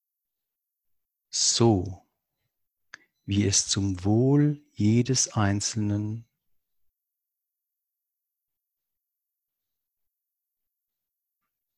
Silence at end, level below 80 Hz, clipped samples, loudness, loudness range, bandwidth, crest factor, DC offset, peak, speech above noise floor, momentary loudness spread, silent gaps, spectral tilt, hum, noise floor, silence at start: 5.55 s; -52 dBFS; under 0.1%; -24 LUFS; 8 LU; 11.5 kHz; 22 dB; under 0.1%; -8 dBFS; 62 dB; 10 LU; none; -4.5 dB/octave; none; -85 dBFS; 1.35 s